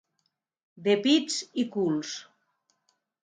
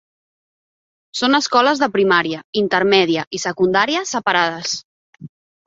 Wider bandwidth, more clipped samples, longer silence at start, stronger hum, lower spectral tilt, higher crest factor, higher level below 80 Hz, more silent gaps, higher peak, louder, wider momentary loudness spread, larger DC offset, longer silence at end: first, 9.6 kHz vs 7.8 kHz; neither; second, 0.75 s vs 1.15 s; neither; about the same, -4 dB/octave vs -3.5 dB/octave; about the same, 18 dB vs 18 dB; second, -80 dBFS vs -62 dBFS; second, none vs 2.44-2.53 s, 3.27-3.31 s, 4.85-5.13 s; second, -12 dBFS vs -2 dBFS; second, -27 LUFS vs -17 LUFS; first, 12 LU vs 9 LU; neither; first, 1 s vs 0.4 s